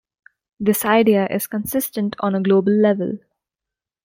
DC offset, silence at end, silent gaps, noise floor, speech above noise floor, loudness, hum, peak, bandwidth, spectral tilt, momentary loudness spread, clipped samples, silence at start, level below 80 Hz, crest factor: under 0.1%; 0.9 s; none; -87 dBFS; 70 dB; -19 LUFS; none; -4 dBFS; 16.5 kHz; -5.5 dB/octave; 8 LU; under 0.1%; 0.6 s; -60 dBFS; 16 dB